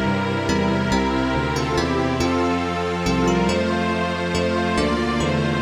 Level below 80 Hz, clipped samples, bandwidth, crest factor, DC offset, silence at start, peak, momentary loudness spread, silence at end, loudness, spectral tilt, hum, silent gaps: -36 dBFS; under 0.1%; 15 kHz; 14 dB; under 0.1%; 0 s; -8 dBFS; 2 LU; 0 s; -21 LUFS; -5.5 dB/octave; none; none